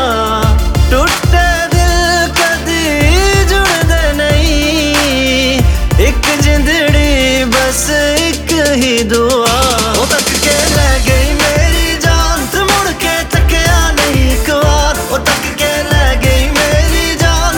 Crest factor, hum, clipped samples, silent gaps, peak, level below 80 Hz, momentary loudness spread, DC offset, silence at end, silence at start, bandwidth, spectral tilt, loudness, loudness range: 10 dB; none; under 0.1%; none; 0 dBFS; -14 dBFS; 2 LU; under 0.1%; 0 s; 0 s; 19.5 kHz; -4 dB/octave; -10 LUFS; 1 LU